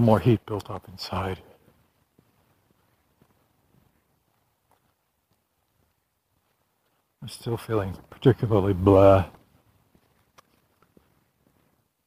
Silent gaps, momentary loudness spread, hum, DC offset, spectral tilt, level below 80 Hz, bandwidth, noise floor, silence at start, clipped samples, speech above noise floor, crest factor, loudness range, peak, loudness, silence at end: none; 21 LU; none; under 0.1%; -8 dB/octave; -52 dBFS; 15.5 kHz; -73 dBFS; 0 s; under 0.1%; 51 dB; 24 dB; 16 LU; -4 dBFS; -23 LUFS; 2.75 s